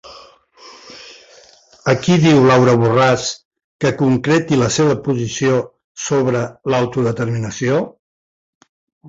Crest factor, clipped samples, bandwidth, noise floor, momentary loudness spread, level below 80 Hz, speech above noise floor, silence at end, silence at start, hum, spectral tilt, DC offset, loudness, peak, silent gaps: 16 dB; under 0.1%; 8 kHz; -47 dBFS; 17 LU; -50 dBFS; 32 dB; 0 s; 0.05 s; none; -5.5 dB/octave; under 0.1%; -16 LUFS; -2 dBFS; 3.45-3.51 s, 3.64-3.79 s, 5.84-5.95 s, 7.99-8.61 s, 8.69-9.01 s